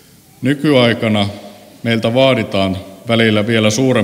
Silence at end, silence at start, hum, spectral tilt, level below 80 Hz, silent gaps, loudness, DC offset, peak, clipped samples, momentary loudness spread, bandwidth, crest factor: 0 s; 0.4 s; none; -5.5 dB/octave; -54 dBFS; none; -14 LUFS; under 0.1%; 0 dBFS; under 0.1%; 10 LU; 16 kHz; 14 dB